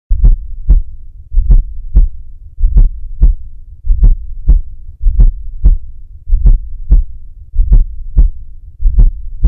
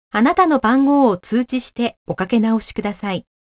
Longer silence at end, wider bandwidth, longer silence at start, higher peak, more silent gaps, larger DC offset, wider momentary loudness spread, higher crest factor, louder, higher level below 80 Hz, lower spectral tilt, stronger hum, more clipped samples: second, 0 s vs 0.3 s; second, 0.9 kHz vs 4 kHz; about the same, 0.1 s vs 0.15 s; about the same, 0 dBFS vs -2 dBFS; second, none vs 1.97-2.06 s; neither; first, 15 LU vs 11 LU; about the same, 10 dB vs 14 dB; about the same, -16 LUFS vs -18 LUFS; first, -10 dBFS vs -50 dBFS; first, -13 dB/octave vs -10.5 dB/octave; neither; first, 3% vs under 0.1%